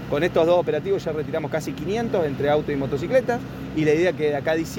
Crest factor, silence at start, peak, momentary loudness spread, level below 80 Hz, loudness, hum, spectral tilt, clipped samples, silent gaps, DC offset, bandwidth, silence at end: 16 dB; 0 s; -6 dBFS; 7 LU; -48 dBFS; -23 LUFS; none; -6.5 dB/octave; under 0.1%; none; under 0.1%; 17 kHz; 0 s